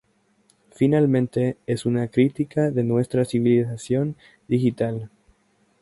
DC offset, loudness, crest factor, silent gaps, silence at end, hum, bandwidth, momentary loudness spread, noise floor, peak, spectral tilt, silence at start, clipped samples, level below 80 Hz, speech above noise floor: under 0.1%; -22 LUFS; 18 dB; none; 0.75 s; none; 11.5 kHz; 8 LU; -64 dBFS; -6 dBFS; -8 dB/octave; 0.8 s; under 0.1%; -58 dBFS; 42 dB